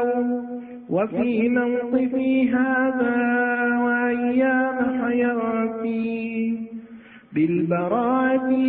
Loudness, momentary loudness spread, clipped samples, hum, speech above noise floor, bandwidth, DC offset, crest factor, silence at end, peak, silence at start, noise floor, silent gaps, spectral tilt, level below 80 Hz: -22 LUFS; 7 LU; under 0.1%; none; 23 dB; 3.9 kHz; under 0.1%; 14 dB; 0 s; -8 dBFS; 0 s; -44 dBFS; none; -11.5 dB/octave; -62 dBFS